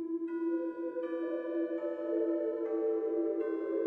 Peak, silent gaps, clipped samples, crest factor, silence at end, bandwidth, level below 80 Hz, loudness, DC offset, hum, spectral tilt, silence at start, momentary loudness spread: -22 dBFS; none; under 0.1%; 12 dB; 0 s; 3.4 kHz; -86 dBFS; -35 LUFS; under 0.1%; none; -7.5 dB/octave; 0 s; 4 LU